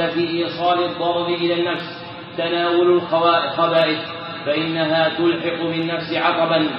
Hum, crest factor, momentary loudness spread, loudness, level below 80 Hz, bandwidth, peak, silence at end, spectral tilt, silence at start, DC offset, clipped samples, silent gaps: none; 16 dB; 9 LU; -19 LUFS; -66 dBFS; 5.8 kHz; -4 dBFS; 0 s; -3 dB/octave; 0 s; under 0.1%; under 0.1%; none